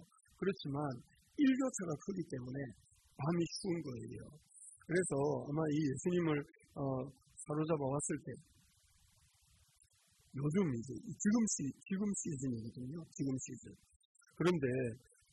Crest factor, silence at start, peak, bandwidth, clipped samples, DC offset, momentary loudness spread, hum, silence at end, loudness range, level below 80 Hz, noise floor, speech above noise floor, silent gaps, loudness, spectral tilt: 18 dB; 0 s; -22 dBFS; 12 kHz; under 0.1%; under 0.1%; 17 LU; none; 0.35 s; 4 LU; -70 dBFS; -71 dBFS; 33 dB; 13.96-14.15 s; -39 LUFS; -5.5 dB/octave